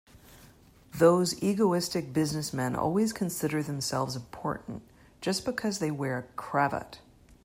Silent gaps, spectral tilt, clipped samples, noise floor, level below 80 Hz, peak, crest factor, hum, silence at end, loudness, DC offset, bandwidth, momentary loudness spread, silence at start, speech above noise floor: none; -5 dB/octave; under 0.1%; -56 dBFS; -60 dBFS; -8 dBFS; 22 dB; none; 0.45 s; -29 LUFS; under 0.1%; 16 kHz; 12 LU; 0.15 s; 27 dB